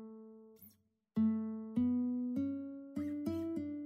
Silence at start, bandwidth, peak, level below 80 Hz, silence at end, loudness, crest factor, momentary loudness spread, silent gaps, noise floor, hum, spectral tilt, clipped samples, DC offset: 0 s; 15.5 kHz; -24 dBFS; -74 dBFS; 0 s; -38 LUFS; 14 dB; 18 LU; none; -68 dBFS; none; -9 dB/octave; under 0.1%; under 0.1%